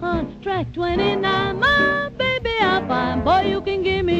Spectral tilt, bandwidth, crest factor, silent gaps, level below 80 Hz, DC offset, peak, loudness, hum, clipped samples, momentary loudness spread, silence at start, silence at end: -6.5 dB/octave; 8.2 kHz; 14 dB; none; -38 dBFS; under 0.1%; -6 dBFS; -20 LUFS; none; under 0.1%; 8 LU; 0 s; 0 s